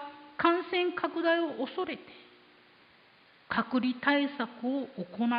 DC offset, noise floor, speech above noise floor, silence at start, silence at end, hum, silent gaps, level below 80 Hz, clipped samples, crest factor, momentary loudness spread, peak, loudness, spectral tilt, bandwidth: under 0.1%; -61 dBFS; 30 dB; 0 s; 0 s; none; none; -72 dBFS; under 0.1%; 20 dB; 10 LU; -12 dBFS; -31 LUFS; -8.5 dB/octave; 5.2 kHz